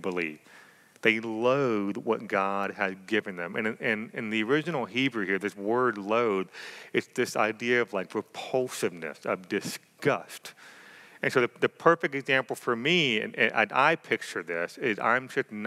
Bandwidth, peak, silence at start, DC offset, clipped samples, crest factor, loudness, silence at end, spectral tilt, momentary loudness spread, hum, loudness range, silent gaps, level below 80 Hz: 15.5 kHz; -6 dBFS; 0 s; under 0.1%; under 0.1%; 22 dB; -28 LUFS; 0 s; -4.5 dB/octave; 9 LU; none; 5 LU; none; under -90 dBFS